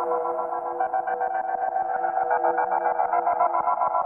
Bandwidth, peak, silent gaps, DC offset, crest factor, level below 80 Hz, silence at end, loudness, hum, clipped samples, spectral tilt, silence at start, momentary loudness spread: 3 kHz; -10 dBFS; none; under 0.1%; 14 dB; -70 dBFS; 0 s; -25 LUFS; none; under 0.1%; -8 dB/octave; 0 s; 4 LU